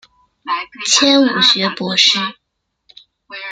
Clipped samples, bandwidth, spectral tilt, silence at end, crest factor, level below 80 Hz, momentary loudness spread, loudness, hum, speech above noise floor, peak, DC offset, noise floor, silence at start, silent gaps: under 0.1%; 9.6 kHz; -2 dB/octave; 0 s; 18 dB; -64 dBFS; 18 LU; -13 LUFS; none; 48 dB; 0 dBFS; under 0.1%; -62 dBFS; 0.45 s; none